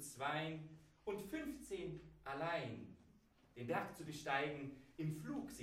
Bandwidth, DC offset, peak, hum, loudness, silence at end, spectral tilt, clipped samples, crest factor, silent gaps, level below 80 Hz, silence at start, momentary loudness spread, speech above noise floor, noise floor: 16 kHz; under 0.1%; -26 dBFS; none; -46 LUFS; 0 s; -5 dB/octave; under 0.1%; 20 dB; none; -70 dBFS; 0 s; 12 LU; 25 dB; -70 dBFS